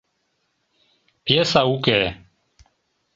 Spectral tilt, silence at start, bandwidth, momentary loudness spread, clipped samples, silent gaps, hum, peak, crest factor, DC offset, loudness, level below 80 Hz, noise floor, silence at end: -5 dB/octave; 1.25 s; 8 kHz; 9 LU; under 0.1%; none; none; -2 dBFS; 22 dB; under 0.1%; -19 LUFS; -52 dBFS; -71 dBFS; 1 s